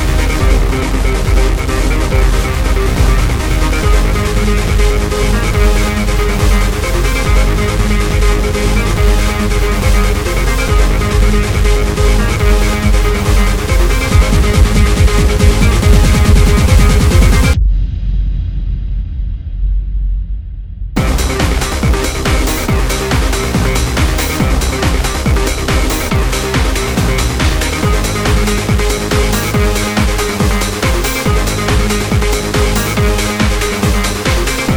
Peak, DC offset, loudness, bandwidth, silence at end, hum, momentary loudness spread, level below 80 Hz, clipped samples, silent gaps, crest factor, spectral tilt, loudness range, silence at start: 0 dBFS; under 0.1%; -13 LUFS; over 20 kHz; 0 s; none; 5 LU; -12 dBFS; under 0.1%; none; 10 dB; -5 dB/octave; 4 LU; 0 s